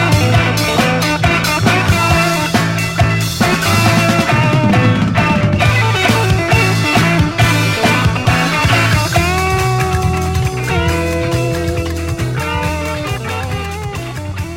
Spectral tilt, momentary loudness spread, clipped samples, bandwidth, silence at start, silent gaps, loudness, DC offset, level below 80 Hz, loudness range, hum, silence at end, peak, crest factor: -5 dB/octave; 8 LU; under 0.1%; 16.5 kHz; 0 s; none; -13 LUFS; under 0.1%; -28 dBFS; 5 LU; none; 0 s; 0 dBFS; 14 dB